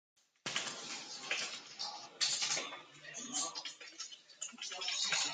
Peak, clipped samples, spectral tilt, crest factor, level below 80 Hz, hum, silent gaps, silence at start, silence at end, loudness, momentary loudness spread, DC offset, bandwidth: -20 dBFS; under 0.1%; 1 dB/octave; 22 dB; -90 dBFS; none; none; 0.45 s; 0 s; -39 LUFS; 13 LU; under 0.1%; 12.5 kHz